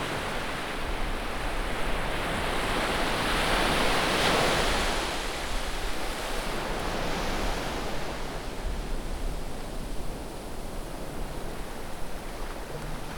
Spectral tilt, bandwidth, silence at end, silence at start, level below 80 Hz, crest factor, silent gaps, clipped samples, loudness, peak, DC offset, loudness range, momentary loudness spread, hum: -3.5 dB/octave; over 20 kHz; 0 s; 0 s; -34 dBFS; 18 dB; none; under 0.1%; -30 LUFS; -12 dBFS; under 0.1%; 12 LU; 14 LU; none